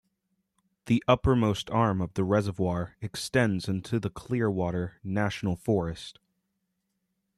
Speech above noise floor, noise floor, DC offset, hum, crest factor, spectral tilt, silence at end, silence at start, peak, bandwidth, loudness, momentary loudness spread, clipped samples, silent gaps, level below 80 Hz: 52 dB; -79 dBFS; under 0.1%; none; 22 dB; -6.5 dB/octave; 1.25 s; 0.85 s; -8 dBFS; 13 kHz; -28 LUFS; 10 LU; under 0.1%; none; -50 dBFS